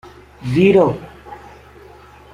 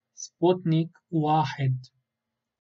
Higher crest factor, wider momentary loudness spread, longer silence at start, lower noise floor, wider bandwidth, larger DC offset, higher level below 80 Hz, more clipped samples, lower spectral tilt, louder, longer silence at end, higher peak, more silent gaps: about the same, 18 dB vs 18 dB; first, 25 LU vs 8 LU; first, 0.4 s vs 0.2 s; second, -42 dBFS vs -85 dBFS; first, 11 kHz vs 7.4 kHz; neither; first, -46 dBFS vs -72 dBFS; neither; about the same, -8 dB/octave vs -7 dB/octave; first, -14 LUFS vs -26 LUFS; first, 0.95 s vs 0.75 s; first, -2 dBFS vs -10 dBFS; neither